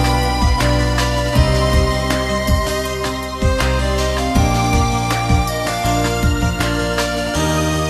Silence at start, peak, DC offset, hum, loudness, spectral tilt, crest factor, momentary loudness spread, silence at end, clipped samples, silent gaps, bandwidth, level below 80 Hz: 0 s; 0 dBFS; under 0.1%; none; -17 LUFS; -5 dB/octave; 16 dB; 4 LU; 0 s; under 0.1%; none; 14 kHz; -22 dBFS